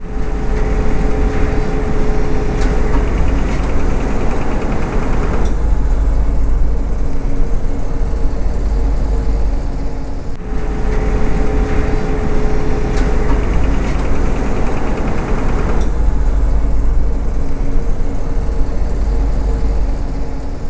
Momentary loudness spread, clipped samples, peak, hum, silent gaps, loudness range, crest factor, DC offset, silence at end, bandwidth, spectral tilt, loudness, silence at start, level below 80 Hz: 5 LU; under 0.1%; 0 dBFS; none; none; 2 LU; 12 dB; under 0.1%; 0 s; 8 kHz; -7.5 dB/octave; -19 LUFS; 0 s; -16 dBFS